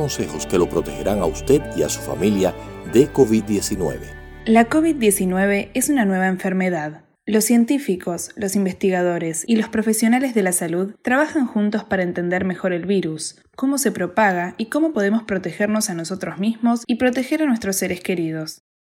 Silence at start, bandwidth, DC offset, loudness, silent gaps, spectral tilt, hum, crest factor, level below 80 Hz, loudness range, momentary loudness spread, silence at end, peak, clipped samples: 0 s; 20 kHz; under 0.1%; -20 LUFS; none; -5 dB/octave; none; 18 dB; -44 dBFS; 3 LU; 8 LU; 0.35 s; 0 dBFS; under 0.1%